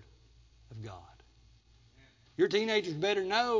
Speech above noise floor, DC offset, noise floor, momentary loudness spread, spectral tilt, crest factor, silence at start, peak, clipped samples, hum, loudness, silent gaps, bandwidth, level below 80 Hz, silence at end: 32 dB; under 0.1%; -62 dBFS; 20 LU; -4.5 dB/octave; 20 dB; 0.7 s; -14 dBFS; under 0.1%; none; -30 LUFS; none; 7.6 kHz; -64 dBFS; 0 s